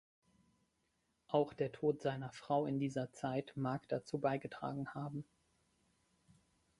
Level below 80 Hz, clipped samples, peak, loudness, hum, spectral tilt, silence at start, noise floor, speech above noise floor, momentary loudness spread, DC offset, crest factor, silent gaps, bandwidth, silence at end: -76 dBFS; under 0.1%; -20 dBFS; -40 LUFS; none; -7.5 dB/octave; 1.3 s; -82 dBFS; 43 dB; 8 LU; under 0.1%; 22 dB; none; 11.5 kHz; 1.55 s